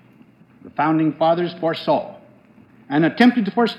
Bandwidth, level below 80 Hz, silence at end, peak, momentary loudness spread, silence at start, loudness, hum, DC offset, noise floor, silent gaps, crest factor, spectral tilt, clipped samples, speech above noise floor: 8 kHz; -72 dBFS; 0 s; -2 dBFS; 8 LU; 0.65 s; -19 LUFS; none; under 0.1%; -50 dBFS; none; 18 dB; -7.5 dB/octave; under 0.1%; 32 dB